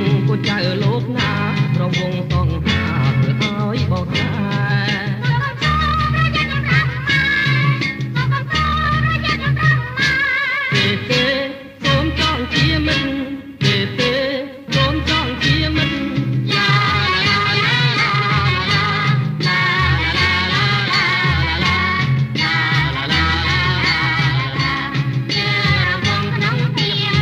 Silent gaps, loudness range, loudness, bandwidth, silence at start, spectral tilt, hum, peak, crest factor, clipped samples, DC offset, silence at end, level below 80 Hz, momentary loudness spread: none; 3 LU; -16 LUFS; 9 kHz; 0 s; -5.5 dB/octave; none; -2 dBFS; 14 dB; under 0.1%; under 0.1%; 0 s; -32 dBFS; 5 LU